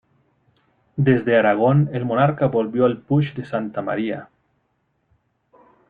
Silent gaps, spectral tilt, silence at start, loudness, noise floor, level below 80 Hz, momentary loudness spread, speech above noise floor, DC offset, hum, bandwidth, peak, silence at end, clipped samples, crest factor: none; -10.5 dB/octave; 0.95 s; -20 LUFS; -69 dBFS; -60 dBFS; 10 LU; 50 dB; under 0.1%; none; 4.4 kHz; -4 dBFS; 1.65 s; under 0.1%; 18 dB